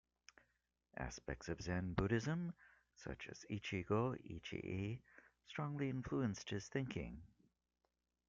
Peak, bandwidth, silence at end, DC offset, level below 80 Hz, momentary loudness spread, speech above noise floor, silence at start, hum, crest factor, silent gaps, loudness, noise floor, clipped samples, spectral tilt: -24 dBFS; 7.6 kHz; 1 s; under 0.1%; -62 dBFS; 13 LU; 44 dB; 0.95 s; 60 Hz at -70 dBFS; 22 dB; none; -44 LUFS; -88 dBFS; under 0.1%; -6 dB/octave